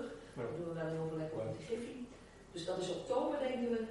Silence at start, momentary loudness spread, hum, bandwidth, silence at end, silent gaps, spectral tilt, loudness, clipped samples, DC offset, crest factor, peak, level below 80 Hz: 0 s; 12 LU; none; 11.5 kHz; 0 s; none; -6 dB/octave; -40 LUFS; under 0.1%; under 0.1%; 18 dB; -22 dBFS; -66 dBFS